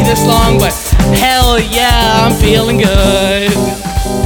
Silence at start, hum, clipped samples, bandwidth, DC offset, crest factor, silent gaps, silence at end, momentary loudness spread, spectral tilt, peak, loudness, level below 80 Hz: 0 s; none; under 0.1%; 20 kHz; under 0.1%; 10 dB; none; 0 s; 4 LU; -4.5 dB/octave; 0 dBFS; -10 LUFS; -16 dBFS